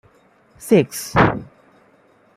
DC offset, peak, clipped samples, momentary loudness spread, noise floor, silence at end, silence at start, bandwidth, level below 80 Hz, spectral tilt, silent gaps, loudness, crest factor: under 0.1%; -2 dBFS; under 0.1%; 14 LU; -55 dBFS; 0.9 s; 0.6 s; 16 kHz; -44 dBFS; -6 dB/octave; none; -17 LUFS; 20 dB